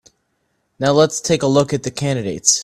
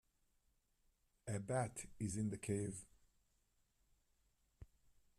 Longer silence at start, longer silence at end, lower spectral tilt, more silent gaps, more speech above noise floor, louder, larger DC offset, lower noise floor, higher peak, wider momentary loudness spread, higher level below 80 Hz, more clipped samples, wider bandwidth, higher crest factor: second, 0.8 s vs 1.25 s; second, 0 s vs 0.55 s; second, -4 dB/octave vs -6 dB/octave; neither; first, 51 dB vs 37 dB; first, -17 LUFS vs -44 LUFS; neither; second, -68 dBFS vs -80 dBFS; first, 0 dBFS vs -28 dBFS; about the same, 7 LU vs 7 LU; first, -52 dBFS vs -70 dBFS; neither; about the same, 15 kHz vs 14 kHz; about the same, 18 dB vs 20 dB